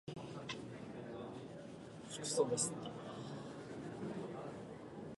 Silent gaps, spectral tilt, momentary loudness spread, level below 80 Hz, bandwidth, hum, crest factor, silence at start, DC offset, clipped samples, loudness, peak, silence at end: none; -4 dB/octave; 14 LU; -74 dBFS; 11.5 kHz; none; 24 dB; 0.05 s; under 0.1%; under 0.1%; -44 LUFS; -22 dBFS; 0 s